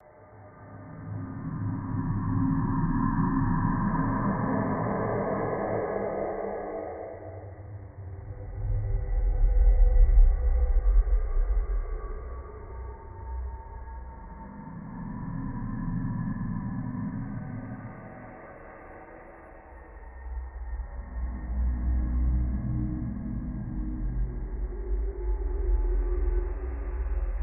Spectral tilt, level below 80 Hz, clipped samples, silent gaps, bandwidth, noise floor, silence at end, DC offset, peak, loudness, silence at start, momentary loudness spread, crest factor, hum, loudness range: -14.5 dB/octave; -30 dBFS; under 0.1%; none; 2.4 kHz; -50 dBFS; 0 s; under 0.1%; -10 dBFS; -31 LUFS; 0.2 s; 18 LU; 18 dB; none; 13 LU